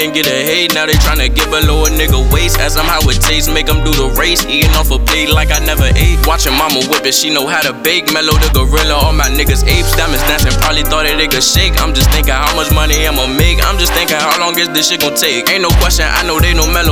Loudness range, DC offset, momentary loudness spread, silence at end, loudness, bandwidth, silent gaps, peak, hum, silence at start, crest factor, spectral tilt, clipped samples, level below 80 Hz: 0 LU; under 0.1%; 2 LU; 0 s; -10 LUFS; 17.5 kHz; none; 0 dBFS; none; 0 s; 10 dB; -3 dB/octave; 0.2%; -14 dBFS